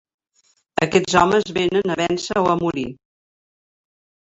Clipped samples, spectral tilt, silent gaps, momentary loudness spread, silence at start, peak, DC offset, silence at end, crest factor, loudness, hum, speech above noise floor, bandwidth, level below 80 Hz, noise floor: under 0.1%; -5 dB/octave; none; 11 LU; 0.8 s; -2 dBFS; under 0.1%; 1.3 s; 20 dB; -19 LUFS; none; 44 dB; 8.2 kHz; -52 dBFS; -63 dBFS